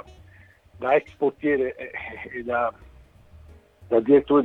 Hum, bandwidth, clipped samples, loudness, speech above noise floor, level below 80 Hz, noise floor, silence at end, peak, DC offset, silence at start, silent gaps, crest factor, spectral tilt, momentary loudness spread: none; 4.1 kHz; under 0.1%; -24 LUFS; 30 dB; -54 dBFS; -52 dBFS; 0 s; -6 dBFS; under 0.1%; 0.8 s; none; 20 dB; -8 dB/octave; 15 LU